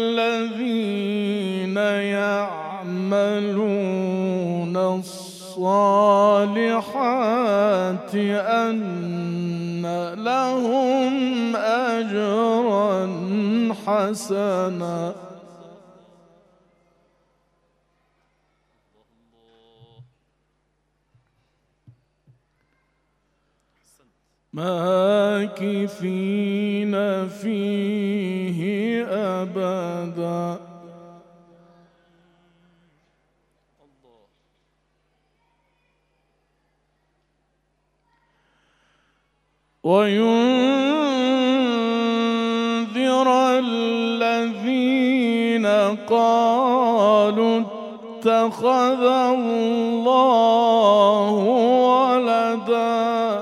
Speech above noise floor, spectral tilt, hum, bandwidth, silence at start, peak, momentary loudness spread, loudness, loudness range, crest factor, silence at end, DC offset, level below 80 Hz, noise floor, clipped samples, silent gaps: 50 dB; -6 dB/octave; 50 Hz at -70 dBFS; 14 kHz; 0 s; -4 dBFS; 10 LU; -20 LUFS; 10 LU; 18 dB; 0 s; under 0.1%; -72 dBFS; -69 dBFS; under 0.1%; none